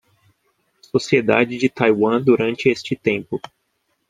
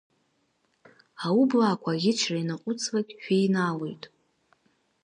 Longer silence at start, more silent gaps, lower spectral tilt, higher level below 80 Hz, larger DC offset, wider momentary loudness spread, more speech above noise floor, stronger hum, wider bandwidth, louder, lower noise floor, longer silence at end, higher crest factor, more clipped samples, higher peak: second, 0.95 s vs 1.2 s; neither; about the same, -6 dB/octave vs -5 dB/octave; first, -60 dBFS vs -78 dBFS; neither; second, 8 LU vs 12 LU; first, 52 dB vs 46 dB; neither; about the same, 9.6 kHz vs 10.5 kHz; first, -18 LUFS vs -26 LUFS; about the same, -70 dBFS vs -72 dBFS; second, 0.7 s vs 0.95 s; about the same, 20 dB vs 16 dB; neither; first, 0 dBFS vs -12 dBFS